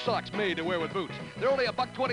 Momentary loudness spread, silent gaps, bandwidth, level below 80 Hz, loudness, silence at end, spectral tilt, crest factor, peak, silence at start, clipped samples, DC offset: 6 LU; none; 11 kHz; -62 dBFS; -30 LUFS; 0 s; -5.5 dB/octave; 14 dB; -16 dBFS; 0 s; under 0.1%; under 0.1%